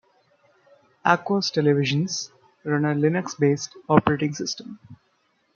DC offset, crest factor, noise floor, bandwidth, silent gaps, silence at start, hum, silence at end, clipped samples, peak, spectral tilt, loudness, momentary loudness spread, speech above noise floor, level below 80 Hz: under 0.1%; 22 dB; -67 dBFS; 7.2 kHz; none; 1.05 s; none; 0.6 s; under 0.1%; -2 dBFS; -5.5 dB/octave; -23 LUFS; 10 LU; 45 dB; -62 dBFS